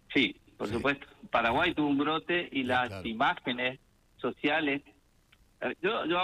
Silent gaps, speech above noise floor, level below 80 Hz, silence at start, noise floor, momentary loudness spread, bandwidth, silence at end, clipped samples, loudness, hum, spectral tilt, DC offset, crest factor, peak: none; 34 dB; -60 dBFS; 0.1 s; -64 dBFS; 10 LU; 11.5 kHz; 0 s; under 0.1%; -30 LUFS; none; -5.5 dB/octave; under 0.1%; 18 dB; -12 dBFS